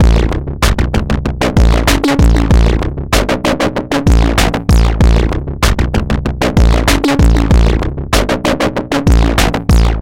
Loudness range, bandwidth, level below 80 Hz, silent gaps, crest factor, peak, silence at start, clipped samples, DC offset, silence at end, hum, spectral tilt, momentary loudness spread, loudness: 1 LU; 16.5 kHz; -12 dBFS; none; 10 dB; 0 dBFS; 0 s; under 0.1%; under 0.1%; 0 s; none; -5.5 dB/octave; 5 LU; -12 LUFS